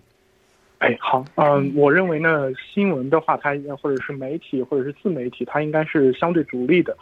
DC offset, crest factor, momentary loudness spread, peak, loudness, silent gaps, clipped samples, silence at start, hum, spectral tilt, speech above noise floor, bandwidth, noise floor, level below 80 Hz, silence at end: under 0.1%; 18 dB; 9 LU; -4 dBFS; -21 LUFS; none; under 0.1%; 0.8 s; none; -8.5 dB/octave; 39 dB; 6.8 kHz; -59 dBFS; -64 dBFS; 0.05 s